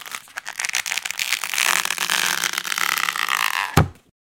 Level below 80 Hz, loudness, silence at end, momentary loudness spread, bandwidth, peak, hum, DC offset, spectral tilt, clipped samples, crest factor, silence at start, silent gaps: -46 dBFS; -21 LUFS; 0.45 s; 8 LU; 17.5 kHz; 0 dBFS; none; under 0.1%; -2 dB/octave; under 0.1%; 24 dB; 0 s; none